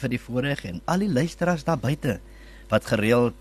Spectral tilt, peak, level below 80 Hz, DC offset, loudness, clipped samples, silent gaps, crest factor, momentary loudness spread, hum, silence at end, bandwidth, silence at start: -6.5 dB/octave; -8 dBFS; -46 dBFS; under 0.1%; -25 LUFS; under 0.1%; none; 18 dB; 7 LU; none; 0 s; 13 kHz; 0 s